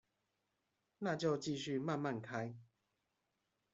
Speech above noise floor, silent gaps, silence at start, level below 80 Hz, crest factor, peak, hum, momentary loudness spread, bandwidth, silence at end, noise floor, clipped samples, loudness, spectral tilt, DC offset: 46 dB; none; 1 s; -82 dBFS; 18 dB; -24 dBFS; none; 8 LU; 8 kHz; 1.1 s; -86 dBFS; under 0.1%; -41 LUFS; -5.5 dB/octave; under 0.1%